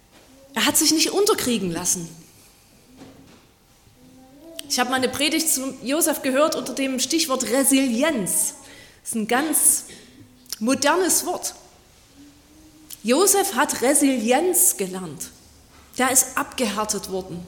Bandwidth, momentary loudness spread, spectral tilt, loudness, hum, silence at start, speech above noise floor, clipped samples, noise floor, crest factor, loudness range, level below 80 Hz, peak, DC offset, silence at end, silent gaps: 17.5 kHz; 15 LU; -2 dB/octave; -20 LUFS; none; 0.55 s; 33 dB; under 0.1%; -54 dBFS; 20 dB; 6 LU; -58 dBFS; -2 dBFS; under 0.1%; 0 s; none